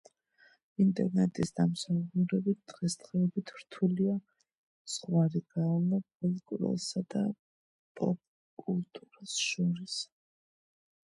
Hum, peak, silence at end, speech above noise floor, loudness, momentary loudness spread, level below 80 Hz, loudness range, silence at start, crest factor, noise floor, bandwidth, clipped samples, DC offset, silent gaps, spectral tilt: none; -16 dBFS; 1.15 s; 34 dB; -32 LUFS; 10 LU; -72 dBFS; 5 LU; 0.8 s; 18 dB; -66 dBFS; 11.5 kHz; under 0.1%; under 0.1%; 4.57-4.85 s, 6.15-6.20 s, 7.39-7.95 s, 8.27-8.57 s; -6 dB/octave